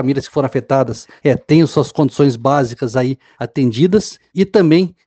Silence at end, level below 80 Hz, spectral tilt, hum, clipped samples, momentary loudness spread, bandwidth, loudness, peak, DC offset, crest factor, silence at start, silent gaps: 0.15 s; -50 dBFS; -7 dB/octave; none; under 0.1%; 8 LU; 8.8 kHz; -15 LUFS; 0 dBFS; under 0.1%; 14 dB; 0 s; none